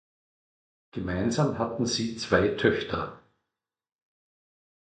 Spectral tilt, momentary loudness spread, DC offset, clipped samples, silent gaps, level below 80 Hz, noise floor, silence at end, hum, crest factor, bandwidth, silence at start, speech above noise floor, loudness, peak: -5 dB/octave; 11 LU; under 0.1%; under 0.1%; none; -52 dBFS; -88 dBFS; 1.75 s; none; 22 dB; 9.2 kHz; 0.95 s; 61 dB; -27 LUFS; -8 dBFS